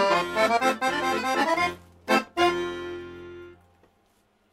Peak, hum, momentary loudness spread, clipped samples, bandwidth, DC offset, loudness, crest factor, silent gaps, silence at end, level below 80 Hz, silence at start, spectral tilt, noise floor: -8 dBFS; none; 19 LU; under 0.1%; 16 kHz; under 0.1%; -24 LUFS; 20 dB; none; 1 s; -60 dBFS; 0 s; -3.5 dB/octave; -66 dBFS